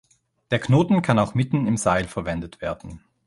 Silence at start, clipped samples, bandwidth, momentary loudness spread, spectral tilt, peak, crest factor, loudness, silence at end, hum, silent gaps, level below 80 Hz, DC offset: 0.5 s; under 0.1%; 11.5 kHz; 12 LU; -6.5 dB/octave; -2 dBFS; 20 dB; -22 LUFS; 0.3 s; none; none; -46 dBFS; under 0.1%